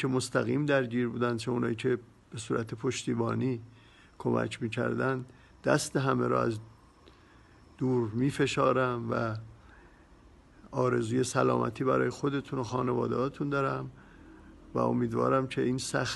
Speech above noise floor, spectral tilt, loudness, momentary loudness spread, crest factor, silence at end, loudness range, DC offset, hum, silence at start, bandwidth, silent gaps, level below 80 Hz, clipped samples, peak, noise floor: 28 dB; -6 dB/octave; -30 LUFS; 8 LU; 20 dB; 0 s; 3 LU; under 0.1%; none; 0 s; 12 kHz; none; -60 dBFS; under 0.1%; -10 dBFS; -57 dBFS